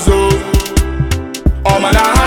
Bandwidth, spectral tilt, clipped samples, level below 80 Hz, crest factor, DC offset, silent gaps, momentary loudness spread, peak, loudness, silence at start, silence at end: 18 kHz; -5 dB/octave; under 0.1%; -16 dBFS; 12 dB; under 0.1%; none; 7 LU; 0 dBFS; -13 LUFS; 0 s; 0 s